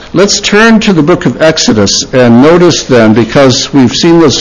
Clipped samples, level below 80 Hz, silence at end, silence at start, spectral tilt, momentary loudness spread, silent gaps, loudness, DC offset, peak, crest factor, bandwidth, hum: 7%; -32 dBFS; 0 s; 0 s; -4.5 dB/octave; 3 LU; none; -5 LUFS; under 0.1%; 0 dBFS; 6 dB; 11 kHz; none